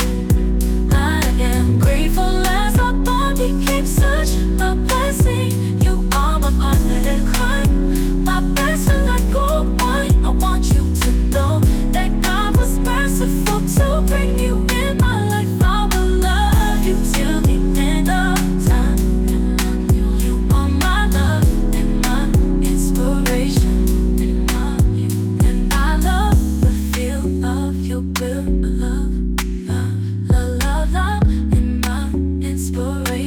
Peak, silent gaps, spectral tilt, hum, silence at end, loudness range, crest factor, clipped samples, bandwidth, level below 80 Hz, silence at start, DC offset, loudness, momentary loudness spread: -4 dBFS; none; -5.5 dB/octave; none; 0 s; 2 LU; 10 dB; under 0.1%; 19 kHz; -18 dBFS; 0 s; under 0.1%; -18 LUFS; 4 LU